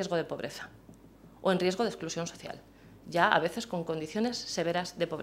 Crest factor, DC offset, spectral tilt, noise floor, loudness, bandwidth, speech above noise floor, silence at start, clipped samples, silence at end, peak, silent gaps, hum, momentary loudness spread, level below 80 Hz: 24 dB; under 0.1%; -4.5 dB/octave; -55 dBFS; -31 LUFS; 16 kHz; 23 dB; 0 s; under 0.1%; 0 s; -8 dBFS; none; none; 18 LU; -64 dBFS